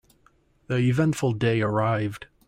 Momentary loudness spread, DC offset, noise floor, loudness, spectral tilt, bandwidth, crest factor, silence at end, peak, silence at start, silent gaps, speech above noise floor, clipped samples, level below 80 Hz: 6 LU; under 0.1%; -62 dBFS; -24 LUFS; -7 dB/octave; 14.5 kHz; 14 dB; 0.25 s; -12 dBFS; 0.7 s; none; 39 dB; under 0.1%; -56 dBFS